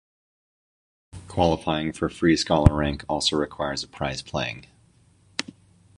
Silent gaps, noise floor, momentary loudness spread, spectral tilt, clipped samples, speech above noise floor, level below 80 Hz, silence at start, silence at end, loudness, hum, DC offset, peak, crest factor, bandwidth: none; -58 dBFS; 13 LU; -5.5 dB/octave; under 0.1%; 35 dB; -38 dBFS; 1.15 s; 0.6 s; -24 LUFS; none; under 0.1%; -2 dBFS; 24 dB; 11.5 kHz